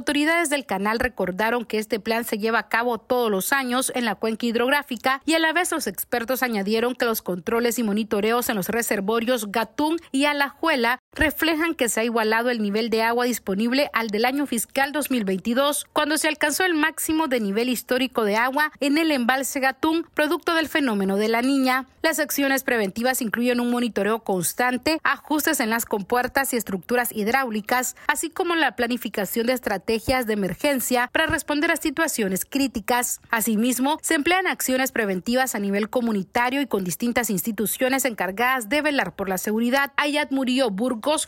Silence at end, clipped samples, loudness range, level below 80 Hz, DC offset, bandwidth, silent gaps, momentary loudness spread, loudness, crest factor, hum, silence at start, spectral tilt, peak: 0 s; under 0.1%; 1 LU; -52 dBFS; under 0.1%; 16.5 kHz; 10.99-11.12 s; 4 LU; -22 LUFS; 18 dB; none; 0 s; -3.5 dB/octave; -4 dBFS